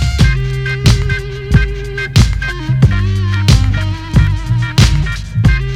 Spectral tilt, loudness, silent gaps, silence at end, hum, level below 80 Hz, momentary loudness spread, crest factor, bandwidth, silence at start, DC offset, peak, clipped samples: -5.5 dB/octave; -13 LUFS; none; 0 s; none; -18 dBFS; 7 LU; 12 dB; 14.5 kHz; 0 s; under 0.1%; 0 dBFS; 0.2%